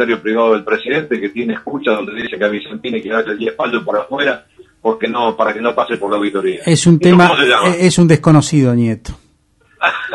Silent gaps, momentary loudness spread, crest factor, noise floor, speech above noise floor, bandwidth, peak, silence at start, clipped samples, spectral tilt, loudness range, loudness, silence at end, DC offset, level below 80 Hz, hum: none; 11 LU; 14 dB; -54 dBFS; 41 dB; 11.5 kHz; 0 dBFS; 0 s; under 0.1%; -5.5 dB/octave; 7 LU; -14 LUFS; 0 s; under 0.1%; -44 dBFS; none